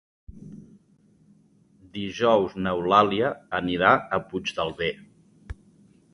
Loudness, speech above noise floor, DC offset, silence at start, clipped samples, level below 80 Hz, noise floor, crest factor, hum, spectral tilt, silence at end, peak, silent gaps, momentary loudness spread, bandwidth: -24 LUFS; 36 dB; under 0.1%; 0.3 s; under 0.1%; -52 dBFS; -60 dBFS; 22 dB; none; -5.5 dB/octave; 0.6 s; -4 dBFS; none; 25 LU; 11 kHz